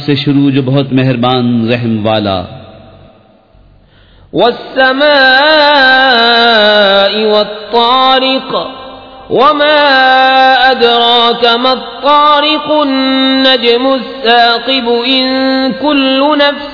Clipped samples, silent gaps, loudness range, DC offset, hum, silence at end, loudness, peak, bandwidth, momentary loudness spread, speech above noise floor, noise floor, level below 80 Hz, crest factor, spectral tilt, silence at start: 1%; none; 7 LU; 0.2%; none; 0 s; -8 LUFS; 0 dBFS; 5.4 kHz; 7 LU; 34 dB; -43 dBFS; -46 dBFS; 8 dB; -6.5 dB/octave; 0 s